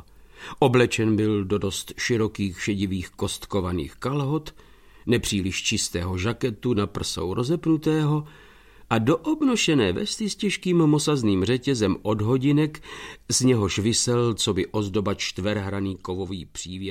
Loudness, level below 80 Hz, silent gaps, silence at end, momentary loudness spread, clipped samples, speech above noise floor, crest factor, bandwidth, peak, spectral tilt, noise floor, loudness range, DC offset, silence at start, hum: -24 LUFS; -48 dBFS; none; 0 s; 10 LU; under 0.1%; 20 dB; 18 dB; 16.5 kHz; -6 dBFS; -5 dB/octave; -44 dBFS; 4 LU; under 0.1%; 0.2 s; none